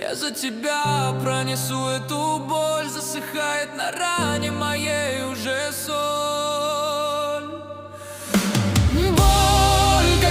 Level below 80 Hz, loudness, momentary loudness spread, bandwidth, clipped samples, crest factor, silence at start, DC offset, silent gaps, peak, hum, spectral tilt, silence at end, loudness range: -30 dBFS; -21 LUFS; 10 LU; 16 kHz; under 0.1%; 16 dB; 0 s; under 0.1%; none; -4 dBFS; none; -4 dB/octave; 0 s; 4 LU